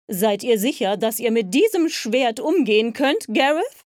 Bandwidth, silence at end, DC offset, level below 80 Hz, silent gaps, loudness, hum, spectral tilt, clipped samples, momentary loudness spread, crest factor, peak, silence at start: 18.5 kHz; 0.15 s; under 0.1%; -74 dBFS; none; -20 LUFS; none; -4 dB/octave; under 0.1%; 4 LU; 16 dB; -4 dBFS; 0.1 s